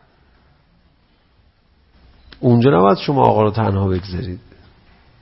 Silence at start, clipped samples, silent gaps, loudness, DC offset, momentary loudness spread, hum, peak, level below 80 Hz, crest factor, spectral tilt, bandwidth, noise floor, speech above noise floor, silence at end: 2.4 s; under 0.1%; none; -16 LUFS; under 0.1%; 15 LU; none; 0 dBFS; -46 dBFS; 18 dB; -11 dB/octave; 5.8 kHz; -57 dBFS; 42 dB; 0.8 s